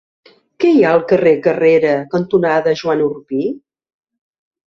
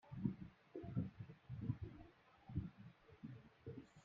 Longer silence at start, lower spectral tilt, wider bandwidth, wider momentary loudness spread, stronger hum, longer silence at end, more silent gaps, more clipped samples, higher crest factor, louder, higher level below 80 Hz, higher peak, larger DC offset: first, 0.6 s vs 0.05 s; second, -7.5 dB/octave vs -9.5 dB/octave; about the same, 7 kHz vs 6.8 kHz; second, 9 LU vs 16 LU; neither; first, 1.1 s vs 0 s; neither; neither; second, 14 dB vs 24 dB; first, -14 LUFS vs -51 LUFS; first, -56 dBFS vs -66 dBFS; first, -2 dBFS vs -26 dBFS; neither